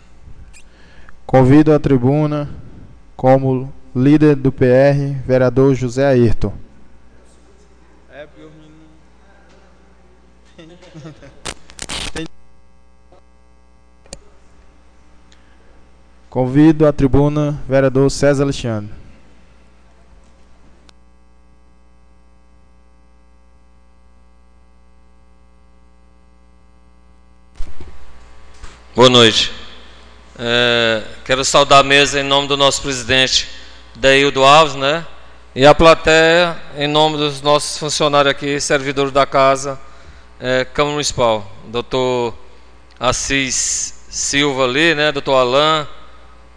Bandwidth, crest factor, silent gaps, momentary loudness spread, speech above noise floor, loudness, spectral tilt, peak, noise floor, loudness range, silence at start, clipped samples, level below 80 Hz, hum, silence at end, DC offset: 10 kHz; 16 dB; none; 16 LU; 37 dB; -14 LUFS; -4 dB/octave; 0 dBFS; -50 dBFS; 19 LU; 0.15 s; under 0.1%; -36 dBFS; none; 0.45 s; 0.5%